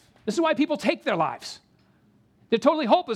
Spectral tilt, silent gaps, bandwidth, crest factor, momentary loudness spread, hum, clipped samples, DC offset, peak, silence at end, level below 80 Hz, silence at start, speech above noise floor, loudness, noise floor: -5 dB/octave; none; 13.5 kHz; 20 dB; 14 LU; none; under 0.1%; under 0.1%; -4 dBFS; 0 s; -72 dBFS; 0.25 s; 38 dB; -24 LUFS; -61 dBFS